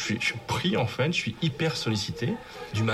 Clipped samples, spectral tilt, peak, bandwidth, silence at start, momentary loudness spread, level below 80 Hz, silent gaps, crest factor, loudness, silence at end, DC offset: under 0.1%; -5 dB/octave; -12 dBFS; 13.5 kHz; 0 s; 6 LU; -56 dBFS; none; 16 dB; -28 LUFS; 0 s; under 0.1%